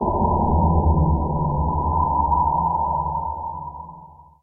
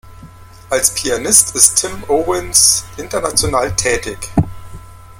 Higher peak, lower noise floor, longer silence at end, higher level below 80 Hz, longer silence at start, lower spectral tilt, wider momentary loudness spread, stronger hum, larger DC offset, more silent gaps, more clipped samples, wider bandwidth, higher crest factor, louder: second, -6 dBFS vs 0 dBFS; first, -44 dBFS vs -37 dBFS; first, 0.2 s vs 0 s; first, -28 dBFS vs -36 dBFS; about the same, 0 s vs 0.05 s; first, -16.5 dB/octave vs -2 dB/octave; about the same, 13 LU vs 11 LU; neither; neither; neither; second, under 0.1% vs 0.2%; second, 1.2 kHz vs over 20 kHz; about the same, 14 dB vs 16 dB; second, -21 LUFS vs -13 LUFS